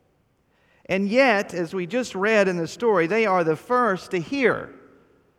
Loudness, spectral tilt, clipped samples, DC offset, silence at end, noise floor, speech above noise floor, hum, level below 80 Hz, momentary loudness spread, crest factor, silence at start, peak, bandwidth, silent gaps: -22 LUFS; -5.5 dB/octave; under 0.1%; under 0.1%; 0.65 s; -65 dBFS; 43 dB; none; -64 dBFS; 9 LU; 18 dB; 0.9 s; -4 dBFS; 14 kHz; none